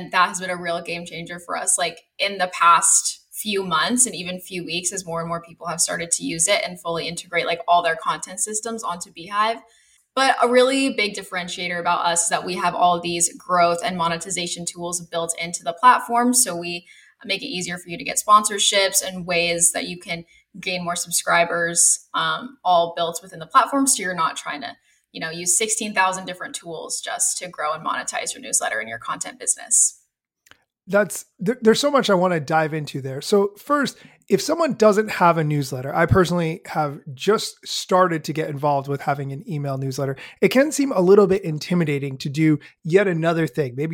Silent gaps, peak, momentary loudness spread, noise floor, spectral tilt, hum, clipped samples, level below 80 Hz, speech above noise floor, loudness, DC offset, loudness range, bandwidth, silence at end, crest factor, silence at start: none; -2 dBFS; 12 LU; -63 dBFS; -3 dB/octave; none; under 0.1%; -54 dBFS; 42 dB; -20 LUFS; under 0.1%; 4 LU; 17 kHz; 0 s; 18 dB; 0 s